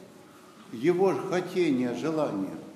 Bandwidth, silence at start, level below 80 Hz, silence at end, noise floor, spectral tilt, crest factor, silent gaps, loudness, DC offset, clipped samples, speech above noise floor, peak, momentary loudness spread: 13.5 kHz; 0 s; -80 dBFS; 0 s; -51 dBFS; -6.5 dB/octave; 16 dB; none; -28 LUFS; under 0.1%; under 0.1%; 24 dB; -12 dBFS; 6 LU